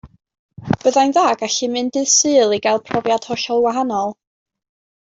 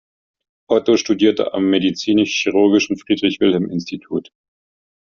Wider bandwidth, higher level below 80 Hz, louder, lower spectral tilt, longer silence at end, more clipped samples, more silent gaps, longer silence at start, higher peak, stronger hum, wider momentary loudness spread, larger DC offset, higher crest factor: first, 8 kHz vs 7.2 kHz; about the same, -56 dBFS vs -58 dBFS; about the same, -17 LUFS vs -17 LUFS; about the same, -3 dB/octave vs -4 dB/octave; about the same, 0.95 s vs 0.85 s; neither; first, 0.39-0.49 s vs none; second, 0.05 s vs 0.7 s; about the same, -2 dBFS vs -2 dBFS; neither; second, 8 LU vs 11 LU; neither; about the same, 16 dB vs 16 dB